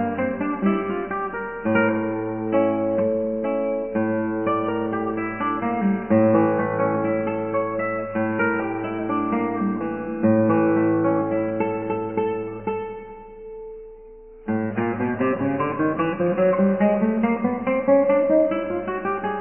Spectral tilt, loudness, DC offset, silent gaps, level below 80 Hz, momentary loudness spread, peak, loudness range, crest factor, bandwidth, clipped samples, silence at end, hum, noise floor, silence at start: -11.5 dB/octave; -22 LUFS; under 0.1%; none; -52 dBFS; 9 LU; -6 dBFS; 7 LU; 16 dB; 3.3 kHz; under 0.1%; 0 s; none; -43 dBFS; 0 s